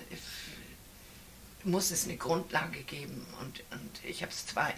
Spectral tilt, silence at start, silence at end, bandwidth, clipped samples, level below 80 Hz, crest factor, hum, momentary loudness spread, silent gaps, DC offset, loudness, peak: -3 dB/octave; 0 s; 0 s; 16 kHz; under 0.1%; -60 dBFS; 24 dB; none; 21 LU; none; under 0.1%; -36 LUFS; -14 dBFS